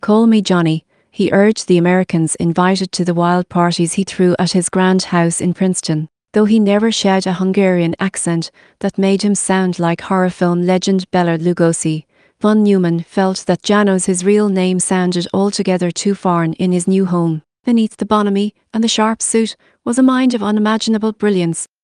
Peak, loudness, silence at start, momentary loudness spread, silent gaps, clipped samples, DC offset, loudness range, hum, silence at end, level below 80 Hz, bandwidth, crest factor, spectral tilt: 0 dBFS; -15 LUFS; 0.05 s; 6 LU; none; under 0.1%; under 0.1%; 2 LU; none; 0.2 s; -56 dBFS; 11 kHz; 14 dB; -5.5 dB/octave